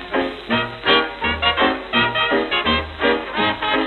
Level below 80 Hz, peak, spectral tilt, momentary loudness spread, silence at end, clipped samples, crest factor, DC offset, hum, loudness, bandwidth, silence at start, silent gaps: -40 dBFS; -2 dBFS; -6.5 dB/octave; 5 LU; 0 s; under 0.1%; 16 dB; under 0.1%; none; -18 LUFS; 9 kHz; 0 s; none